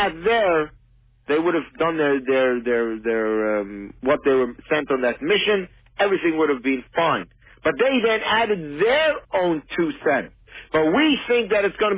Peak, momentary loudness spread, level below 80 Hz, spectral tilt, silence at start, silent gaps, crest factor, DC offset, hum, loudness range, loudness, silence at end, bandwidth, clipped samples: -6 dBFS; 7 LU; -52 dBFS; -8.5 dB/octave; 0 s; none; 14 dB; under 0.1%; none; 1 LU; -21 LUFS; 0 s; 4 kHz; under 0.1%